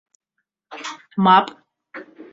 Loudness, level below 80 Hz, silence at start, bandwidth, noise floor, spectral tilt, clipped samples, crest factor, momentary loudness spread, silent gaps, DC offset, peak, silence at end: -16 LUFS; -70 dBFS; 0.7 s; 7.8 kHz; -78 dBFS; -5.5 dB/octave; under 0.1%; 20 dB; 25 LU; none; under 0.1%; -2 dBFS; 0.3 s